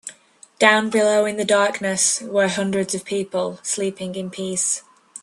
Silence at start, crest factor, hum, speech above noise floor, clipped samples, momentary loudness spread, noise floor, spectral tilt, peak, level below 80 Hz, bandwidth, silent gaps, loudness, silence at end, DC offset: 0.05 s; 20 dB; none; 30 dB; under 0.1%; 10 LU; -50 dBFS; -2.5 dB/octave; 0 dBFS; -66 dBFS; 12.5 kHz; none; -20 LUFS; 0.05 s; under 0.1%